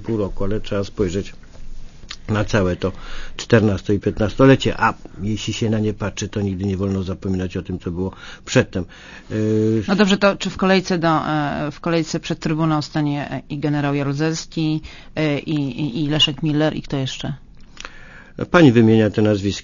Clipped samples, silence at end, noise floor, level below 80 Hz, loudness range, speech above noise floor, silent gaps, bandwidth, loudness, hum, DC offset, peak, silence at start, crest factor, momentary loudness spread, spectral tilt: under 0.1%; 0 s; -39 dBFS; -36 dBFS; 5 LU; 20 dB; none; 7.4 kHz; -19 LUFS; none; under 0.1%; 0 dBFS; 0 s; 20 dB; 14 LU; -6 dB/octave